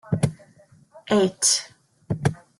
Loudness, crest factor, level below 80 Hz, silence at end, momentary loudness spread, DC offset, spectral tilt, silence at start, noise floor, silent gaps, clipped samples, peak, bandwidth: -23 LUFS; 20 dB; -54 dBFS; 0.25 s; 11 LU; under 0.1%; -4 dB/octave; 0.05 s; -55 dBFS; none; under 0.1%; -6 dBFS; 12.5 kHz